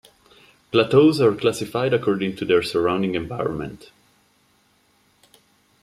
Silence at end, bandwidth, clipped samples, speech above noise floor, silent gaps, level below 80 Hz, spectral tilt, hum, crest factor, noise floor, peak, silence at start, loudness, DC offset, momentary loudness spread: 2.05 s; 14.5 kHz; under 0.1%; 42 dB; none; -56 dBFS; -6 dB/octave; none; 20 dB; -61 dBFS; -2 dBFS; 0.75 s; -20 LUFS; under 0.1%; 11 LU